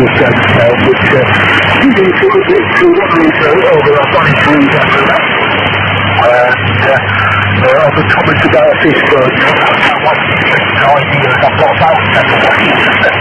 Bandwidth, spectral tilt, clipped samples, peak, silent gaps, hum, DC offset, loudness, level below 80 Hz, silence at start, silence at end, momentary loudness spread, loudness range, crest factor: 12 kHz; -6.5 dB/octave; 1%; 0 dBFS; none; none; under 0.1%; -7 LUFS; -38 dBFS; 0 s; 0 s; 2 LU; 1 LU; 8 dB